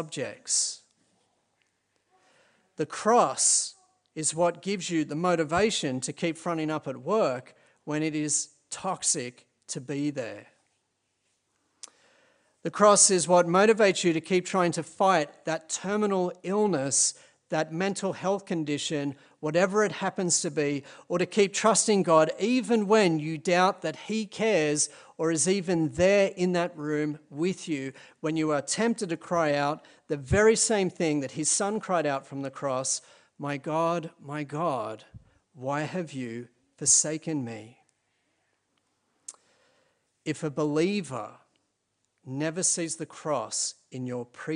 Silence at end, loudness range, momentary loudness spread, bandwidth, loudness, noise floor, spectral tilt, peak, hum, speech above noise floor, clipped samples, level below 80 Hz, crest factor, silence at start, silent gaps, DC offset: 0 s; 9 LU; 15 LU; 10.5 kHz; -26 LUFS; -77 dBFS; -3.5 dB/octave; -6 dBFS; none; 50 dB; under 0.1%; -60 dBFS; 22 dB; 0 s; none; under 0.1%